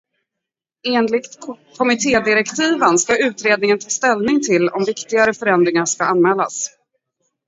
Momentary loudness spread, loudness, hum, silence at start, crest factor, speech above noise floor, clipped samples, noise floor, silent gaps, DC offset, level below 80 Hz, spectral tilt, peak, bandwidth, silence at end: 8 LU; -16 LUFS; none; 0.85 s; 18 dB; 67 dB; under 0.1%; -83 dBFS; none; under 0.1%; -58 dBFS; -3.5 dB/octave; 0 dBFS; 8 kHz; 0.8 s